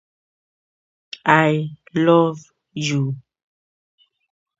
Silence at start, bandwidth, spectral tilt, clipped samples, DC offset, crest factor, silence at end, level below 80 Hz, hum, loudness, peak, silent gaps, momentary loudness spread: 1.25 s; 7.8 kHz; -6 dB/octave; under 0.1%; under 0.1%; 22 dB; 1.4 s; -68 dBFS; none; -19 LUFS; 0 dBFS; none; 20 LU